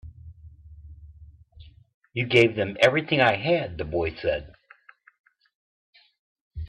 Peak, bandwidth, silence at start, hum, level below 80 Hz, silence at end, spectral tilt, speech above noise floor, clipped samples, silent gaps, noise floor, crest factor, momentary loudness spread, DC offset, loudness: -6 dBFS; 11 kHz; 0.05 s; none; -50 dBFS; 0 s; -6 dB/octave; 32 dB; under 0.1%; 1.94-2.01 s, 5.20-5.24 s, 5.55-5.93 s, 6.19-6.35 s, 6.41-6.51 s; -55 dBFS; 22 dB; 14 LU; under 0.1%; -23 LUFS